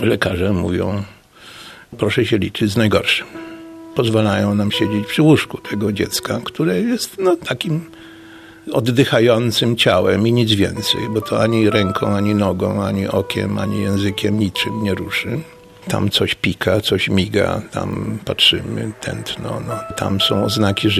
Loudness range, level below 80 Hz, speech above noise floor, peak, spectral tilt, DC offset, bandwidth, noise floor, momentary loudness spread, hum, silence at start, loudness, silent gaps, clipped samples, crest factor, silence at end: 4 LU; -46 dBFS; 23 dB; -2 dBFS; -5.5 dB/octave; under 0.1%; 15.5 kHz; -40 dBFS; 11 LU; none; 0 s; -17 LUFS; none; under 0.1%; 16 dB; 0 s